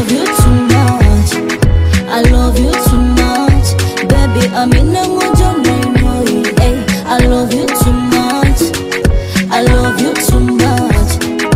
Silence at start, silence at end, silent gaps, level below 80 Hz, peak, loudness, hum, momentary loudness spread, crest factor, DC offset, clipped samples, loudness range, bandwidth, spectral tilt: 0 s; 0 s; none; -16 dBFS; 0 dBFS; -11 LUFS; none; 4 LU; 10 dB; under 0.1%; 0.2%; 1 LU; 16.5 kHz; -5.5 dB/octave